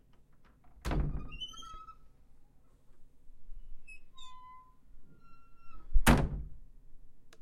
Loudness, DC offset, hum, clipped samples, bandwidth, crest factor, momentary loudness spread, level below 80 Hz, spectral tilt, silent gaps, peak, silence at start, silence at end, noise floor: -34 LUFS; under 0.1%; none; under 0.1%; 16 kHz; 24 dB; 29 LU; -40 dBFS; -5 dB/octave; none; -10 dBFS; 0.35 s; 0 s; -59 dBFS